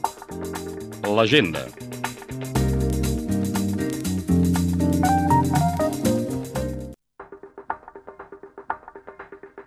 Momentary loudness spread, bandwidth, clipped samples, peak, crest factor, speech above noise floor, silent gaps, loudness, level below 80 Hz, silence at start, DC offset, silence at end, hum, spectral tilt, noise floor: 23 LU; 15.5 kHz; under 0.1%; -4 dBFS; 20 dB; 22 dB; none; -23 LUFS; -38 dBFS; 0 s; under 0.1%; 0.05 s; none; -5.5 dB/octave; -44 dBFS